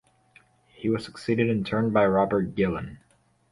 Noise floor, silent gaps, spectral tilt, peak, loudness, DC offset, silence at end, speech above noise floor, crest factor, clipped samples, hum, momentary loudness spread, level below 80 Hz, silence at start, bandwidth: -59 dBFS; none; -8 dB/octave; -8 dBFS; -25 LUFS; under 0.1%; 0.55 s; 35 dB; 18 dB; under 0.1%; none; 10 LU; -52 dBFS; 0.8 s; 11.5 kHz